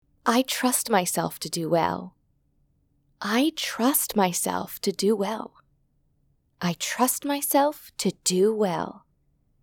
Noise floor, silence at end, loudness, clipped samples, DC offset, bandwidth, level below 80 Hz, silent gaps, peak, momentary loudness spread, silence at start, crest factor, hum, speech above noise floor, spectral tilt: -67 dBFS; 0.65 s; -25 LUFS; under 0.1%; under 0.1%; 20 kHz; -66 dBFS; none; -6 dBFS; 9 LU; 0.25 s; 20 dB; none; 43 dB; -3.5 dB/octave